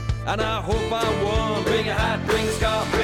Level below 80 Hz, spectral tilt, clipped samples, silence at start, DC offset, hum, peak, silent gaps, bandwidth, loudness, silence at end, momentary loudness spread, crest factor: -32 dBFS; -5 dB/octave; under 0.1%; 0 s; under 0.1%; none; -10 dBFS; none; 17.5 kHz; -23 LUFS; 0 s; 3 LU; 12 dB